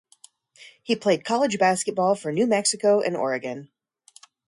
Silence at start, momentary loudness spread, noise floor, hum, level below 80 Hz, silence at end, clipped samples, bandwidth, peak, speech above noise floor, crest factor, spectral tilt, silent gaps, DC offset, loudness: 0.6 s; 9 LU; -55 dBFS; none; -72 dBFS; 0.85 s; under 0.1%; 11.5 kHz; -8 dBFS; 33 dB; 16 dB; -3.5 dB/octave; none; under 0.1%; -23 LUFS